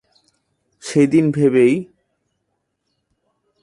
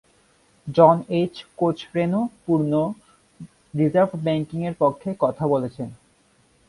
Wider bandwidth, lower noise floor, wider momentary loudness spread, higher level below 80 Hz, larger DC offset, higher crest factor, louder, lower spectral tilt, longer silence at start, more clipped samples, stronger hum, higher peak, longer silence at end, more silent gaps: about the same, 11.5 kHz vs 11.5 kHz; first, -73 dBFS vs -60 dBFS; second, 9 LU vs 15 LU; about the same, -62 dBFS vs -60 dBFS; neither; about the same, 18 dB vs 22 dB; first, -16 LUFS vs -22 LUFS; second, -7 dB/octave vs -8.5 dB/octave; first, 0.85 s vs 0.65 s; neither; neither; about the same, -2 dBFS vs 0 dBFS; first, 1.8 s vs 0.75 s; neither